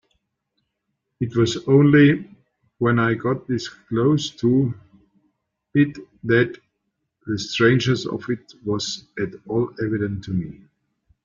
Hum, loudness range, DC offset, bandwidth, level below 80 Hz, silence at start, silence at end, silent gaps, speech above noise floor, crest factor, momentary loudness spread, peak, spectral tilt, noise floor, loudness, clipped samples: none; 5 LU; under 0.1%; 7.6 kHz; -56 dBFS; 1.2 s; 0.75 s; none; 57 dB; 18 dB; 13 LU; -4 dBFS; -6.5 dB/octave; -77 dBFS; -21 LUFS; under 0.1%